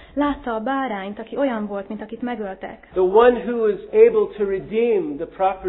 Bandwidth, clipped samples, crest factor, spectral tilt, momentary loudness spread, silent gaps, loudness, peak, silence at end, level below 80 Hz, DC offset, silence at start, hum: 4 kHz; under 0.1%; 18 dB; -10.5 dB/octave; 14 LU; none; -20 LUFS; -2 dBFS; 0 s; -50 dBFS; under 0.1%; 0 s; none